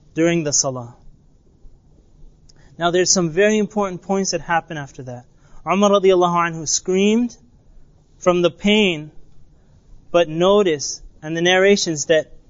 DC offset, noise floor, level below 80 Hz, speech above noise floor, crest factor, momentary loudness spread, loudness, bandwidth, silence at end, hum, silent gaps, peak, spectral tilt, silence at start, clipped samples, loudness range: under 0.1%; -52 dBFS; -48 dBFS; 34 dB; 16 dB; 15 LU; -18 LUFS; 7.8 kHz; 0.25 s; none; none; -2 dBFS; -3.5 dB/octave; 0.15 s; under 0.1%; 3 LU